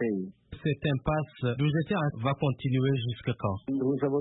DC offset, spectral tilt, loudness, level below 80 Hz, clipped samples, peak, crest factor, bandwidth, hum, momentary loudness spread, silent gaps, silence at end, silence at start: under 0.1%; -11.5 dB/octave; -30 LUFS; -54 dBFS; under 0.1%; -14 dBFS; 14 dB; 4 kHz; none; 5 LU; none; 0 s; 0 s